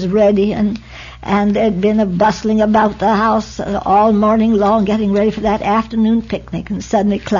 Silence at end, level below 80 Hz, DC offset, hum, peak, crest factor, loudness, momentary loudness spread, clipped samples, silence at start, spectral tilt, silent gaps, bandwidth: 0 s; -38 dBFS; under 0.1%; none; -2 dBFS; 12 dB; -14 LUFS; 9 LU; under 0.1%; 0 s; -7 dB/octave; none; 7.4 kHz